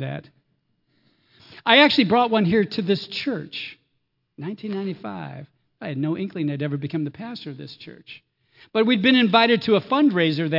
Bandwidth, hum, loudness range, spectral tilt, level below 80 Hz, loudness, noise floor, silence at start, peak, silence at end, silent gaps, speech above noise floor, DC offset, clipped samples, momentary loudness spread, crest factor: 5.8 kHz; none; 10 LU; -7 dB/octave; -68 dBFS; -20 LUFS; -73 dBFS; 0 s; 0 dBFS; 0 s; none; 51 dB; under 0.1%; under 0.1%; 21 LU; 22 dB